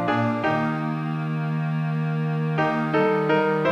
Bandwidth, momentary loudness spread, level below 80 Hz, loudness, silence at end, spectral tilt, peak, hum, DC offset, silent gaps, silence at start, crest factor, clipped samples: 6.6 kHz; 6 LU; -66 dBFS; -23 LUFS; 0 s; -8.5 dB/octave; -8 dBFS; none; under 0.1%; none; 0 s; 14 dB; under 0.1%